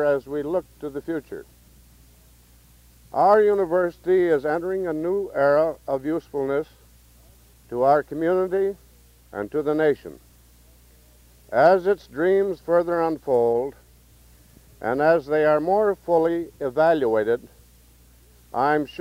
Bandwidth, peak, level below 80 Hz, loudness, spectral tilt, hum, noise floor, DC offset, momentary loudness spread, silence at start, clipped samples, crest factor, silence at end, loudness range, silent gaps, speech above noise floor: 16 kHz; -6 dBFS; -54 dBFS; -22 LUFS; -7 dB/octave; none; -53 dBFS; under 0.1%; 12 LU; 0 s; under 0.1%; 18 dB; 0.05 s; 4 LU; none; 32 dB